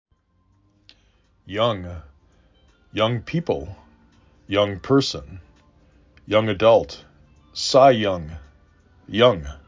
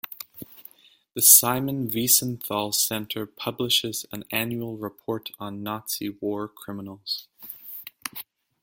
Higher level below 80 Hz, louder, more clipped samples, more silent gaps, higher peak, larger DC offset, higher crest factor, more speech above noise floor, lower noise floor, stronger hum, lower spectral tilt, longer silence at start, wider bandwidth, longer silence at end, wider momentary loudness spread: first, -46 dBFS vs -66 dBFS; about the same, -20 LUFS vs -22 LUFS; neither; neither; about the same, -2 dBFS vs 0 dBFS; neither; about the same, 22 dB vs 26 dB; first, 43 dB vs 27 dB; first, -63 dBFS vs -52 dBFS; neither; first, -5.5 dB/octave vs -2 dB/octave; first, 1.45 s vs 0.1 s; second, 7.6 kHz vs 17 kHz; second, 0.1 s vs 0.4 s; about the same, 22 LU vs 20 LU